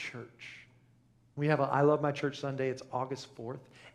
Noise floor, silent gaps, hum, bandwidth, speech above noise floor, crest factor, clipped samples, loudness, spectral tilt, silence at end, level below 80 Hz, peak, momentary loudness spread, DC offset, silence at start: -65 dBFS; none; none; 10.5 kHz; 33 dB; 20 dB; under 0.1%; -32 LUFS; -7 dB/octave; 0.05 s; -74 dBFS; -14 dBFS; 21 LU; under 0.1%; 0 s